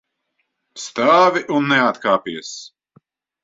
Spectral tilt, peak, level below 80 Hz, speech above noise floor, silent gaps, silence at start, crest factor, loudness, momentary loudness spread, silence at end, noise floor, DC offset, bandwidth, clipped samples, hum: -4 dB/octave; -2 dBFS; -66 dBFS; 55 dB; none; 0.75 s; 18 dB; -17 LUFS; 19 LU; 0.75 s; -72 dBFS; under 0.1%; 7.8 kHz; under 0.1%; none